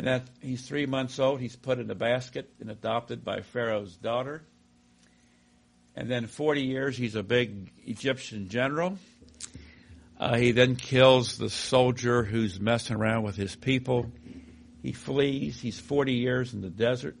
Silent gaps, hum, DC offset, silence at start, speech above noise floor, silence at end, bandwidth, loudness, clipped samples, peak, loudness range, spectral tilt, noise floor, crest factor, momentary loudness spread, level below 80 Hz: none; 60 Hz at -55 dBFS; under 0.1%; 0 s; 35 dB; 0.05 s; 10.5 kHz; -28 LUFS; under 0.1%; -4 dBFS; 9 LU; -5.5 dB/octave; -62 dBFS; 24 dB; 16 LU; -58 dBFS